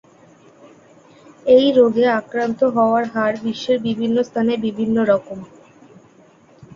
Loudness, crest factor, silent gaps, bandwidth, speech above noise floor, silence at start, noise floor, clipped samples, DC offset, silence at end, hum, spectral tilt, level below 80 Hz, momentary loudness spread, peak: -18 LUFS; 18 dB; none; 7.4 kHz; 33 dB; 1.45 s; -50 dBFS; under 0.1%; under 0.1%; 0.1 s; none; -6.5 dB/octave; -60 dBFS; 9 LU; -2 dBFS